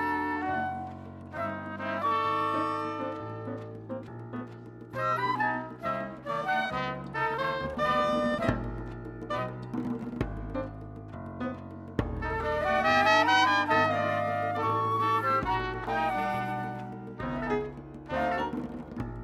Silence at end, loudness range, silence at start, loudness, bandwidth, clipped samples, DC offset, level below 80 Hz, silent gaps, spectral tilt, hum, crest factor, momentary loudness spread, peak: 0 s; 8 LU; 0 s; -30 LUFS; 15 kHz; under 0.1%; under 0.1%; -48 dBFS; none; -5.5 dB/octave; none; 20 dB; 15 LU; -10 dBFS